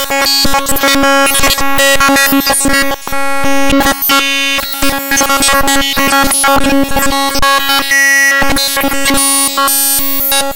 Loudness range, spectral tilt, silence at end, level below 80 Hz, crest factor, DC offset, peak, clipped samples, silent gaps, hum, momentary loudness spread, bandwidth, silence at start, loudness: 2 LU; -1.5 dB/octave; 0 s; -26 dBFS; 8 dB; under 0.1%; 0 dBFS; under 0.1%; none; none; 5 LU; 17.5 kHz; 0 s; -9 LUFS